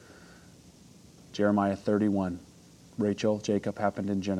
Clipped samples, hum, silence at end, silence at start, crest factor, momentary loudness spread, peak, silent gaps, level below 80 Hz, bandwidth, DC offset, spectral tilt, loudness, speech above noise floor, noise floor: under 0.1%; none; 0 s; 0.2 s; 18 dB; 11 LU; -12 dBFS; none; -66 dBFS; 11 kHz; under 0.1%; -7 dB/octave; -29 LUFS; 26 dB; -54 dBFS